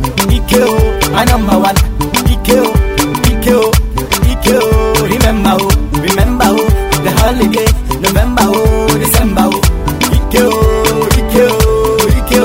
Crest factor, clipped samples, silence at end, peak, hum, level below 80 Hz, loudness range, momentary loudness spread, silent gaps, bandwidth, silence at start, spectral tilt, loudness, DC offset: 10 dB; 0.2%; 0 s; 0 dBFS; none; -14 dBFS; 1 LU; 3 LU; none; 16.5 kHz; 0 s; -5 dB/octave; -10 LUFS; under 0.1%